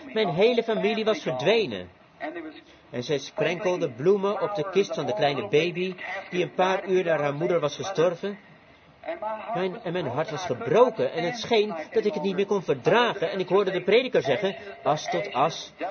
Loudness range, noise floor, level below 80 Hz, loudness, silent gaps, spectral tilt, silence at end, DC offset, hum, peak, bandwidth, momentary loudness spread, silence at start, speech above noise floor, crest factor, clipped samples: 3 LU; -54 dBFS; -70 dBFS; -25 LUFS; none; -5.5 dB/octave; 0 s; under 0.1%; none; -6 dBFS; 6.8 kHz; 12 LU; 0 s; 28 dB; 18 dB; under 0.1%